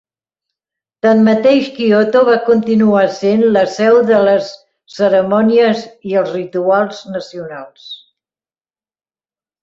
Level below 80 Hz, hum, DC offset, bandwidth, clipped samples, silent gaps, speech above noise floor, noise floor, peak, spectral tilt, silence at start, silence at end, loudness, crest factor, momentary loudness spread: -58 dBFS; none; under 0.1%; 7.6 kHz; under 0.1%; none; over 78 dB; under -90 dBFS; -2 dBFS; -6.5 dB/octave; 1.05 s; 1.65 s; -12 LUFS; 12 dB; 17 LU